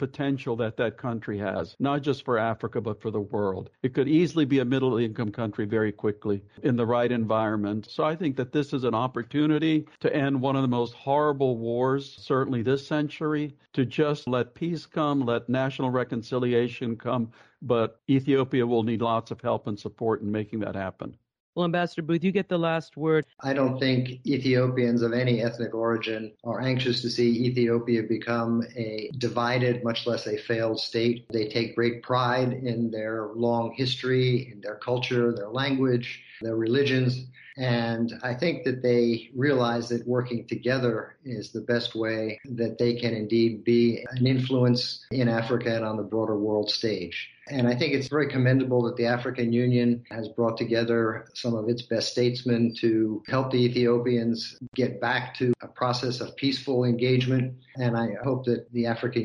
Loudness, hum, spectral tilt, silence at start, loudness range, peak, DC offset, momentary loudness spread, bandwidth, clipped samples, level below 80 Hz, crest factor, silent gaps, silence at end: -26 LUFS; none; -7 dB/octave; 0 s; 2 LU; -10 dBFS; under 0.1%; 8 LU; 10.5 kHz; under 0.1%; -64 dBFS; 14 dB; 21.40-21.53 s, 54.68-54.72 s; 0 s